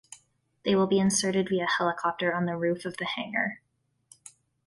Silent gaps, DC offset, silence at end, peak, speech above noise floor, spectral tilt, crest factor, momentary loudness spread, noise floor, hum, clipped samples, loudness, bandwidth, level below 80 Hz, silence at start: none; under 0.1%; 1.1 s; -12 dBFS; 36 dB; -4 dB/octave; 16 dB; 9 LU; -63 dBFS; none; under 0.1%; -27 LUFS; 11.5 kHz; -68 dBFS; 0.1 s